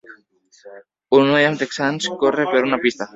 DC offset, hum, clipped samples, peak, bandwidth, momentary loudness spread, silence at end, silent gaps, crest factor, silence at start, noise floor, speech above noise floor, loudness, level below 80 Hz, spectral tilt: under 0.1%; none; under 0.1%; 0 dBFS; 7.8 kHz; 7 LU; 0.1 s; none; 18 dB; 0.1 s; -55 dBFS; 36 dB; -18 LUFS; -62 dBFS; -4.5 dB/octave